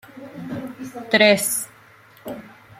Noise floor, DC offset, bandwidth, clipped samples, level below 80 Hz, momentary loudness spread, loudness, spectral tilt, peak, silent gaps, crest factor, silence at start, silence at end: -50 dBFS; under 0.1%; 16.5 kHz; under 0.1%; -66 dBFS; 23 LU; -18 LUFS; -2.5 dB/octave; -2 dBFS; none; 22 dB; 0.15 s; 0.25 s